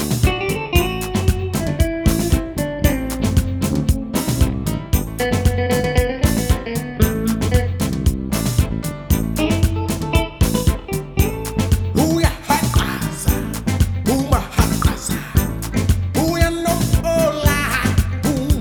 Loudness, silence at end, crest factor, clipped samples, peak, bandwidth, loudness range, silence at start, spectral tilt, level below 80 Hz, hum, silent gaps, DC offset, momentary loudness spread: -19 LUFS; 0 s; 18 dB; under 0.1%; 0 dBFS; over 20 kHz; 1 LU; 0 s; -5.5 dB/octave; -24 dBFS; none; none; under 0.1%; 4 LU